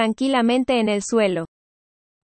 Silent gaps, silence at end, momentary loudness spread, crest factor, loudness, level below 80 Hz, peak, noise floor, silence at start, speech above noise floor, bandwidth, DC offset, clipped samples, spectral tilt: none; 0.75 s; 7 LU; 14 dB; -20 LUFS; -58 dBFS; -6 dBFS; under -90 dBFS; 0 s; over 70 dB; 8.8 kHz; under 0.1%; under 0.1%; -4.5 dB/octave